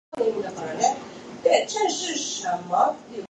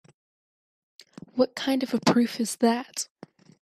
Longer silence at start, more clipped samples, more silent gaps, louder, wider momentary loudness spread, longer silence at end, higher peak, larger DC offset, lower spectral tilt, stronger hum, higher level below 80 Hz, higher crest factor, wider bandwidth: second, 0.1 s vs 1.35 s; neither; neither; about the same, -24 LUFS vs -26 LUFS; about the same, 9 LU vs 11 LU; second, 0.05 s vs 0.55 s; about the same, -4 dBFS vs -6 dBFS; neither; second, -2 dB/octave vs -4 dB/octave; neither; about the same, -68 dBFS vs -72 dBFS; about the same, 22 dB vs 20 dB; second, 9.6 kHz vs 14 kHz